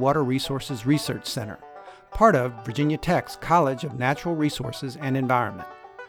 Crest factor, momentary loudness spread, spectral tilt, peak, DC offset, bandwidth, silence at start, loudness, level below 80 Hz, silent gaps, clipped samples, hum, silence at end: 20 dB; 18 LU; -6 dB/octave; -4 dBFS; under 0.1%; 19.5 kHz; 0 s; -24 LUFS; -48 dBFS; none; under 0.1%; none; 0 s